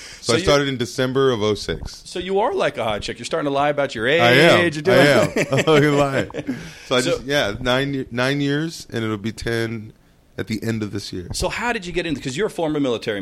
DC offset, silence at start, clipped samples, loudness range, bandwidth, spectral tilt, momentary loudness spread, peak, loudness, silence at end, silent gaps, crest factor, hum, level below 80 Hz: under 0.1%; 0 s; under 0.1%; 9 LU; 16 kHz; -5 dB/octave; 14 LU; -2 dBFS; -19 LUFS; 0 s; none; 18 dB; none; -42 dBFS